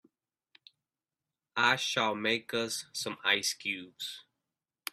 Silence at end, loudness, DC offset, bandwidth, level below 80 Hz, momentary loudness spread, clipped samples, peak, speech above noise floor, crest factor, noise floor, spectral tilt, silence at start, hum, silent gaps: 0.7 s; -31 LUFS; under 0.1%; 14.5 kHz; -78 dBFS; 14 LU; under 0.1%; -10 dBFS; over 58 dB; 24 dB; under -90 dBFS; -1.5 dB/octave; 1.55 s; none; none